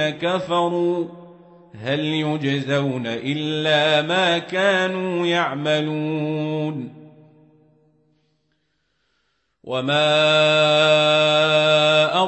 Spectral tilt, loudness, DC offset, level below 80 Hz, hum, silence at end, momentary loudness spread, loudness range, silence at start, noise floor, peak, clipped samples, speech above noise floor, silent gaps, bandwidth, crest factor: -5 dB/octave; -19 LUFS; under 0.1%; -68 dBFS; none; 0 s; 11 LU; 12 LU; 0 s; -70 dBFS; -6 dBFS; under 0.1%; 51 dB; none; 8.4 kHz; 16 dB